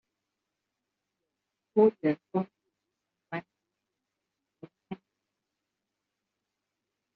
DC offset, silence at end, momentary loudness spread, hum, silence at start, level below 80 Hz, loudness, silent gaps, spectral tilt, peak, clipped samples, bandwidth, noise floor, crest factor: under 0.1%; 2.2 s; 21 LU; none; 1.75 s; -82 dBFS; -29 LUFS; none; -7.5 dB/octave; -10 dBFS; under 0.1%; 4.7 kHz; -86 dBFS; 24 dB